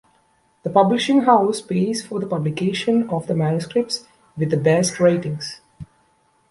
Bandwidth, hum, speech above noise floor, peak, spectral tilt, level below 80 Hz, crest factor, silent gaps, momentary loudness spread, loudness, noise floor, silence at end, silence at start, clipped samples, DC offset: 11.5 kHz; none; 42 dB; -2 dBFS; -5.5 dB/octave; -58 dBFS; 18 dB; none; 12 LU; -20 LUFS; -61 dBFS; 0.65 s; 0.65 s; under 0.1%; under 0.1%